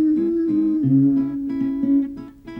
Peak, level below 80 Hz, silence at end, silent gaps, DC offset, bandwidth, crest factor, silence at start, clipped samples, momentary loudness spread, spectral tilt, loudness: -8 dBFS; -52 dBFS; 0 s; none; under 0.1%; 3.5 kHz; 12 dB; 0 s; under 0.1%; 7 LU; -11.5 dB/octave; -20 LUFS